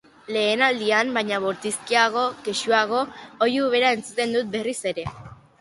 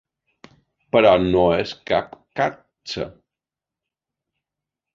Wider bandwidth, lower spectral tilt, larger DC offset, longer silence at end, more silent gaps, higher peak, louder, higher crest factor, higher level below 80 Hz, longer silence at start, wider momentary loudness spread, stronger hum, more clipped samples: first, 11.5 kHz vs 7.6 kHz; second, -3 dB/octave vs -6 dB/octave; neither; second, 0.25 s vs 1.85 s; neither; about the same, -4 dBFS vs -2 dBFS; about the same, -22 LUFS vs -20 LUFS; about the same, 18 dB vs 20 dB; second, -60 dBFS vs -48 dBFS; second, 0.3 s vs 0.95 s; second, 9 LU vs 17 LU; neither; neither